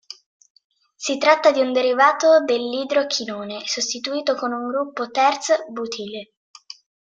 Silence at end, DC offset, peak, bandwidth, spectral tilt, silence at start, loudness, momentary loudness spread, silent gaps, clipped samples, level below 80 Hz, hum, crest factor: 0.85 s; under 0.1%; -2 dBFS; 9.2 kHz; -2 dB/octave; 0.1 s; -20 LUFS; 15 LU; 0.26-0.40 s, 0.50-0.55 s, 0.64-0.70 s; under 0.1%; -74 dBFS; none; 20 dB